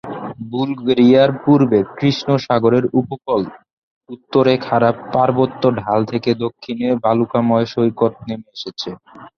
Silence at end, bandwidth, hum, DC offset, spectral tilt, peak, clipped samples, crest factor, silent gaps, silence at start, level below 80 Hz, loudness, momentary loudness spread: 0.1 s; 6.6 kHz; none; under 0.1%; -7.5 dB/octave; -2 dBFS; under 0.1%; 16 dB; 3.73-4.01 s; 0.05 s; -54 dBFS; -16 LUFS; 14 LU